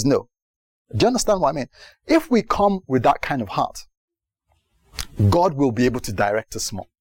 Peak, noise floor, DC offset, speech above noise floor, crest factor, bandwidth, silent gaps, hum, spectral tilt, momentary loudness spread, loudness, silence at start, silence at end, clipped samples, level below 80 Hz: -6 dBFS; -69 dBFS; under 0.1%; 49 dB; 14 dB; 17 kHz; 0.42-0.85 s, 3.97-4.08 s; none; -5.5 dB/octave; 13 LU; -21 LUFS; 0 s; 0.2 s; under 0.1%; -42 dBFS